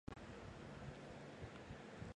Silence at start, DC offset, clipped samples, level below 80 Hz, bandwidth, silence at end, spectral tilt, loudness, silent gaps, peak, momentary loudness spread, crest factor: 0.1 s; under 0.1%; under 0.1%; -64 dBFS; 11 kHz; 0 s; -6 dB/octave; -55 LUFS; none; -34 dBFS; 1 LU; 20 dB